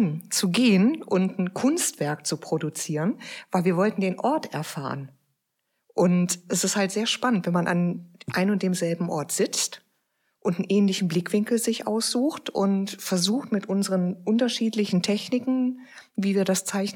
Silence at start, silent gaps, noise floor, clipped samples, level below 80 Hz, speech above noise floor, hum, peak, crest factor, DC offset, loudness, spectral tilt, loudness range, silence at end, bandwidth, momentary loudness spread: 0 s; none; -78 dBFS; under 0.1%; -76 dBFS; 53 dB; none; -8 dBFS; 16 dB; under 0.1%; -25 LUFS; -4.5 dB/octave; 2 LU; 0 s; 17.5 kHz; 7 LU